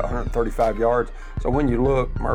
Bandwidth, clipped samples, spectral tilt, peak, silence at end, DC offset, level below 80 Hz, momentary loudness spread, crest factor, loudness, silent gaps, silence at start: 10.5 kHz; under 0.1%; -8 dB/octave; -8 dBFS; 0 s; under 0.1%; -28 dBFS; 6 LU; 12 dB; -22 LUFS; none; 0 s